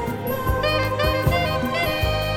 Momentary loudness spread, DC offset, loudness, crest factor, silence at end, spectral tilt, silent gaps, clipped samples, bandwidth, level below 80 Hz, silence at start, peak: 3 LU; under 0.1%; -22 LUFS; 14 dB; 0 s; -5 dB/octave; none; under 0.1%; 17.5 kHz; -32 dBFS; 0 s; -8 dBFS